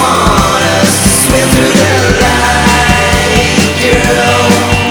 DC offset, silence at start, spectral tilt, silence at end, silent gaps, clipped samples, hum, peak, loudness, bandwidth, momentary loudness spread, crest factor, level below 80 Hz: under 0.1%; 0 s; -3.5 dB/octave; 0 s; none; 0.7%; none; 0 dBFS; -7 LUFS; over 20 kHz; 2 LU; 8 dB; -20 dBFS